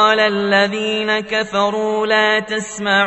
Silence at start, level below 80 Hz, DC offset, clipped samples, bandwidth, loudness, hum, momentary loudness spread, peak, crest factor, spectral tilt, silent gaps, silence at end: 0 s; -56 dBFS; under 0.1%; under 0.1%; 8.4 kHz; -16 LUFS; none; 5 LU; -2 dBFS; 16 dB; -3.5 dB/octave; none; 0 s